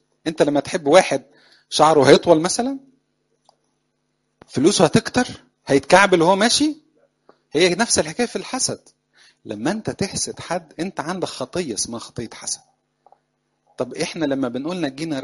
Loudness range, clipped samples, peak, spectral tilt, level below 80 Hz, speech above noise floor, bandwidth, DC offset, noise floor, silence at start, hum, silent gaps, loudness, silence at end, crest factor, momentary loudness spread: 10 LU; under 0.1%; 0 dBFS; -3.5 dB/octave; -54 dBFS; 52 dB; 11.5 kHz; under 0.1%; -71 dBFS; 0.25 s; none; none; -19 LUFS; 0 s; 20 dB; 16 LU